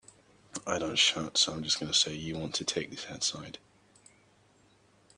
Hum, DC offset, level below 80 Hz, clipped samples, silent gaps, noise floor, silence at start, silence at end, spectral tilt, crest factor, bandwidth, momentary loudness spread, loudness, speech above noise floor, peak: none; under 0.1%; -66 dBFS; under 0.1%; none; -64 dBFS; 0.55 s; 1.6 s; -1.5 dB/octave; 22 dB; 10.5 kHz; 17 LU; -29 LUFS; 33 dB; -12 dBFS